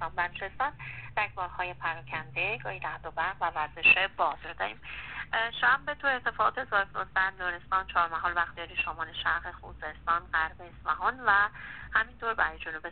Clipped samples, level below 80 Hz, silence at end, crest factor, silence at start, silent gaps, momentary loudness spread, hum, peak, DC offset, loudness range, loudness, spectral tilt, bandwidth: under 0.1%; -54 dBFS; 0 s; 22 dB; 0 s; none; 12 LU; none; -10 dBFS; 0.2%; 4 LU; -29 LUFS; 0 dB/octave; 4.6 kHz